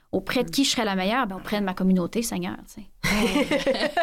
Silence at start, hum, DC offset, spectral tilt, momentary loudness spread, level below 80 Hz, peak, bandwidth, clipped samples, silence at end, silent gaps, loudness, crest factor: 0.15 s; none; under 0.1%; -4.5 dB/octave; 7 LU; -44 dBFS; -12 dBFS; 16.5 kHz; under 0.1%; 0 s; none; -24 LUFS; 12 dB